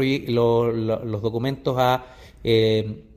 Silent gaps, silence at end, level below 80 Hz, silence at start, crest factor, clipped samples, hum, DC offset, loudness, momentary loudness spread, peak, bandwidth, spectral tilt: none; 0.15 s; -48 dBFS; 0 s; 16 dB; under 0.1%; none; under 0.1%; -22 LUFS; 7 LU; -6 dBFS; 16 kHz; -7 dB/octave